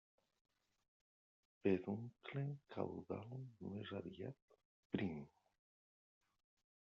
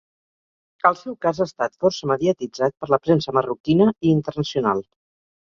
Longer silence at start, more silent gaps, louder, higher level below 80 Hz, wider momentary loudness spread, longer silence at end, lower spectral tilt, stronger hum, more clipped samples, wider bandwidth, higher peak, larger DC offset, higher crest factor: first, 1.65 s vs 0.85 s; first, 4.42-4.48 s, 4.65-4.90 s vs 3.60-3.64 s; second, -47 LUFS vs -21 LUFS; second, -82 dBFS vs -56 dBFS; first, 13 LU vs 7 LU; first, 1.5 s vs 0.75 s; about the same, -7 dB/octave vs -7 dB/octave; neither; neither; about the same, 7 kHz vs 7.4 kHz; second, -24 dBFS vs -2 dBFS; neither; about the same, 24 dB vs 20 dB